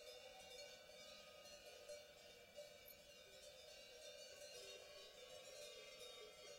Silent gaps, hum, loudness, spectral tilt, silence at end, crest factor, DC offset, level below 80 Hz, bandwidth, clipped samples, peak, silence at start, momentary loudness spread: none; none; -59 LUFS; -0.5 dB/octave; 0 s; 14 dB; under 0.1%; -84 dBFS; 16 kHz; under 0.1%; -46 dBFS; 0 s; 4 LU